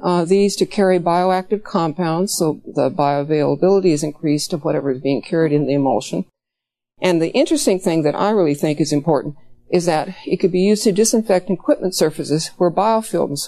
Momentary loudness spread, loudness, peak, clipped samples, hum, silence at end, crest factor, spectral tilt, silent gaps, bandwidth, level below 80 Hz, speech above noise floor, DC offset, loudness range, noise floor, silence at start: 6 LU; -18 LUFS; 0 dBFS; under 0.1%; none; 0 s; 16 dB; -5.5 dB/octave; none; 14 kHz; -58 dBFS; 66 dB; under 0.1%; 2 LU; -83 dBFS; 0 s